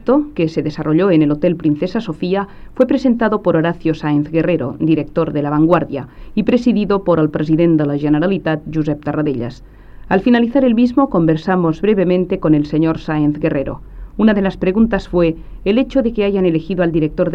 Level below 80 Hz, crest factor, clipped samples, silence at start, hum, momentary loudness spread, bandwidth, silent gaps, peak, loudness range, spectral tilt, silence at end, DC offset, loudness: -36 dBFS; 14 dB; under 0.1%; 0 s; none; 7 LU; 6.6 kHz; none; -2 dBFS; 2 LU; -9 dB/octave; 0 s; under 0.1%; -16 LUFS